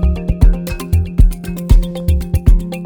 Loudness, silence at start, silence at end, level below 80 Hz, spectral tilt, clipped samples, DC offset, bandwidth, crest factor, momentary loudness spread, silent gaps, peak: -16 LUFS; 0 s; 0 s; -14 dBFS; -7.5 dB/octave; under 0.1%; under 0.1%; 19 kHz; 12 dB; 3 LU; none; 0 dBFS